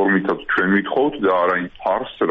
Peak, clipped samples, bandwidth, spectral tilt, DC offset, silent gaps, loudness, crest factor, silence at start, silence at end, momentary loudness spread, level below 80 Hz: -6 dBFS; under 0.1%; 5.2 kHz; -4 dB/octave; under 0.1%; none; -19 LUFS; 14 dB; 0 s; 0 s; 5 LU; -52 dBFS